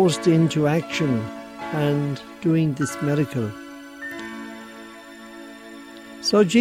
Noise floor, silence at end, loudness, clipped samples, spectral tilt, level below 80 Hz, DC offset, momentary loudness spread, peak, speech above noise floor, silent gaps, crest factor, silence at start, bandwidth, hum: -41 dBFS; 0 s; -23 LUFS; under 0.1%; -6 dB/octave; -60 dBFS; under 0.1%; 21 LU; -6 dBFS; 21 dB; none; 18 dB; 0 s; 15 kHz; none